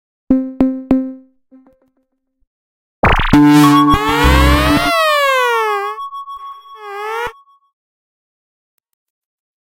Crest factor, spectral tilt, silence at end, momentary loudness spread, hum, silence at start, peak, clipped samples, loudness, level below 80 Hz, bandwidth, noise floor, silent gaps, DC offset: 16 dB; -5.5 dB/octave; 2.4 s; 19 LU; none; 0.3 s; 0 dBFS; under 0.1%; -12 LUFS; -24 dBFS; 16.5 kHz; -66 dBFS; 2.47-3.03 s; under 0.1%